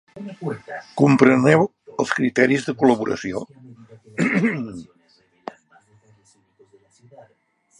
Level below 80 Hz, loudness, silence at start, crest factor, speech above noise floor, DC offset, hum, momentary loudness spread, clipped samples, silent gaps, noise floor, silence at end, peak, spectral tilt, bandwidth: -62 dBFS; -19 LUFS; 0.15 s; 22 dB; 43 dB; under 0.1%; none; 24 LU; under 0.1%; none; -63 dBFS; 2.95 s; 0 dBFS; -6.5 dB/octave; 11 kHz